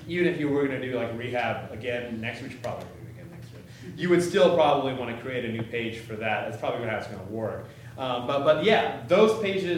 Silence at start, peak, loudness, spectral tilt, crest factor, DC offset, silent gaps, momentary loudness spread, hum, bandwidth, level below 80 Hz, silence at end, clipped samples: 0 s; -8 dBFS; -26 LUFS; -6 dB/octave; 20 dB; under 0.1%; none; 20 LU; none; 16 kHz; -62 dBFS; 0 s; under 0.1%